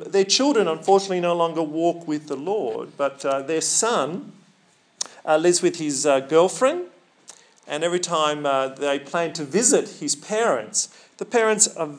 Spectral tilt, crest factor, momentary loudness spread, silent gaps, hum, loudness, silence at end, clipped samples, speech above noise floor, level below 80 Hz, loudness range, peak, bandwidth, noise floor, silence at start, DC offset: -2.5 dB/octave; 22 dB; 11 LU; none; none; -21 LUFS; 0 s; under 0.1%; 38 dB; under -90 dBFS; 3 LU; 0 dBFS; 10.5 kHz; -59 dBFS; 0 s; under 0.1%